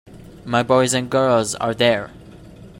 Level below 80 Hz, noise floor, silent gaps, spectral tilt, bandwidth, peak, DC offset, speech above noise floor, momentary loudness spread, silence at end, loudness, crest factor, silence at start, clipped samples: -50 dBFS; -41 dBFS; none; -4 dB/octave; 16 kHz; -2 dBFS; under 0.1%; 23 dB; 9 LU; 0 s; -18 LUFS; 18 dB; 0.1 s; under 0.1%